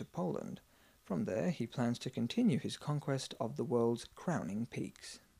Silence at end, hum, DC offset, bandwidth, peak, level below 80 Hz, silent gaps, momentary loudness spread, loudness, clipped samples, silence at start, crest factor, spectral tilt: 0.2 s; none; under 0.1%; 15 kHz; -20 dBFS; -70 dBFS; none; 10 LU; -37 LUFS; under 0.1%; 0 s; 16 dB; -6.5 dB/octave